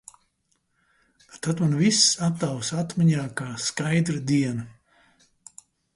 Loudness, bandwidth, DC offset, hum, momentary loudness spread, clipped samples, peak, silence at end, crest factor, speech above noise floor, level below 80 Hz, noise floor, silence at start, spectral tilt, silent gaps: -23 LUFS; 11.5 kHz; under 0.1%; none; 12 LU; under 0.1%; -6 dBFS; 1.25 s; 20 dB; 48 dB; -62 dBFS; -72 dBFS; 1.35 s; -4 dB/octave; none